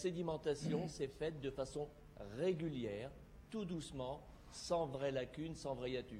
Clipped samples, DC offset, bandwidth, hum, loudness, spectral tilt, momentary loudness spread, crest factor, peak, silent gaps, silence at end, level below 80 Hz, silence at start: under 0.1%; under 0.1%; 15.5 kHz; none; -44 LUFS; -6 dB/octave; 11 LU; 18 dB; -26 dBFS; none; 0 s; -62 dBFS; 0 s